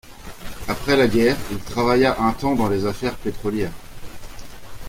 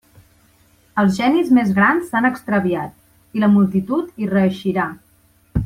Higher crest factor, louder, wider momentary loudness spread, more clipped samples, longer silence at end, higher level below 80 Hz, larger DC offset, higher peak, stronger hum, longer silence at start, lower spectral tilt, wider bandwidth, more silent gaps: about the same, 18 dB vs 14 dB; second, -21 LUFS vs -18 LUFS; first, 23 LU vs 11 LU; neither; about the same, 0 s vs 0 s; about the same, -38 dBFS vs -42 dBFS; neither; about the same, -2 dBFS vs -4 dBFS; neither; second, 0.05 s vs 0.95 s; second, -5.5 dB/octave vs -7.5 dB/octave; about the same, 16.5 kHz vs 15 kHz; neither